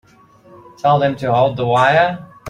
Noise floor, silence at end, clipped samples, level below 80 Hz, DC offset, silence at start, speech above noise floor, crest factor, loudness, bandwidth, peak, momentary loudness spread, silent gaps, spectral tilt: -47 dBFS; 0 s; under 0.1%; -54 dBFS; under 0.1%; 0.85 s; 33 dB; 16 dB; -15 LUFS; 10.5 kHz; -2 dBFS; 5 LU; none; -6.5 dB/octave